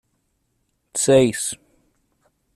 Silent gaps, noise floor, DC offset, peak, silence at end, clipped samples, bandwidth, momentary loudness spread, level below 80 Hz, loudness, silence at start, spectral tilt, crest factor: none; -70 dBFS; under 0.1%; -4 dBFS; 1 s; under 0.1%; 14 kHz; 14 LU; -58 dBFS; -19 LUFS; 0.95 s; -4 dB/octave; 20 dB